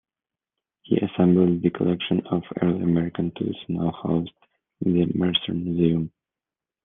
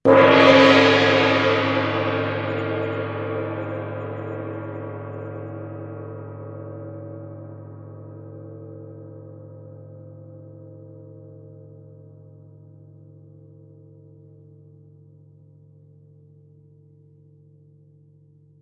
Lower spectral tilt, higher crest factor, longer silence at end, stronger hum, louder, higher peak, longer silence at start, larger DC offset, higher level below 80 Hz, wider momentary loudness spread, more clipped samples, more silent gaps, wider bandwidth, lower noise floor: first, -10.5 dB/octave vs -6 dB/octave; about the same, 18 dB vs 22 dB; second, 0.75 s vs 7 s; neither; second, -23 LUFS vs -19 LUFS; second, -6 dBFS vs -2 dBFS; first, 0.9 s vs 0.05 s; neither; first, -58 dBFS vs -68 dBFS; second, 8 LU vs 30 LU; neither; neither; second, 3.8 kHz vs 8.4 kHz; first, -90 dBFS vs -53 dBFS